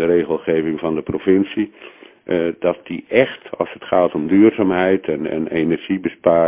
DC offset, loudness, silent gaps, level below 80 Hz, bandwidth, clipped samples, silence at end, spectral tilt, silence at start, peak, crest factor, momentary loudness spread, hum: under 0.1%; -18 LUFS; none; -50 dBFS; 3.8 kHz; under 0.1%; 0 s; -10.5 dB/octave; 0 s; 0 dBFS; 16 dB; 11 LU; none